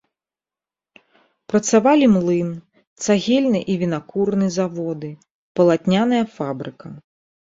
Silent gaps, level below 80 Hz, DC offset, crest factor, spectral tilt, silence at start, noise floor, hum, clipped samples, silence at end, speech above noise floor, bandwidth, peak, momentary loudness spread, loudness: 2.87-2.96 s, 5.31-5.55 s; -60 dBFS; under 0.1%; 18 dB; -5.5 dB/octave; 1.5 s; under -90 dBFS; none; under 0.1%; 0.4 s; over 72 dB; 7.8 kHz; -2 dBFS; 16 LU; -19 LUFS